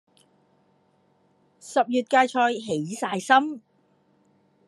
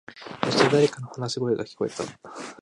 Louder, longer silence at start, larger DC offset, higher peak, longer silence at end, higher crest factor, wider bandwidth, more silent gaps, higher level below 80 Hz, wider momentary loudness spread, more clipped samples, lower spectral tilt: about the same, -23 LUFS vs -25 LUFS; first, 1.65 s vs 0.1 s; neither; about the same, -4 dBFS vs -4 dBFS; first, 1.1 s vs 0.1 s; about the same, 22 dB vs 22 dB; about the same, 12.5 kHz vs 11.5 kHz; neither; second, -84 dBFS vs -64 dBFS; second, 9 LU vs 18 LU; neither; about the same, -4 dB/octave vs -5 dB/octave